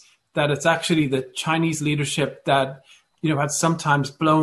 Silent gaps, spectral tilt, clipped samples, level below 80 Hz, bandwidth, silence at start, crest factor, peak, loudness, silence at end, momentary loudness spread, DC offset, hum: none; -4.5 dB/octave; under 0.1%; -58 dBFS; 12.5 kHz; 0.35 s; 18 dB; -4 dBFS; -22 LUFS; 0 s; 5 LU; under 0.1%; none